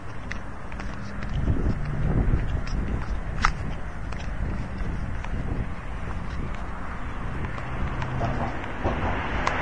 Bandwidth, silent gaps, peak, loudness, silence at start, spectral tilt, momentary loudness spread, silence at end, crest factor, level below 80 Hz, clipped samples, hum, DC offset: 10 kHz; none; -2 dBFS; -30 LUFS; 0 s; -6.5 dB/octave; 9 LU; 0 s; 26 dB; -30 dBFS; under 0.1%; none; 2%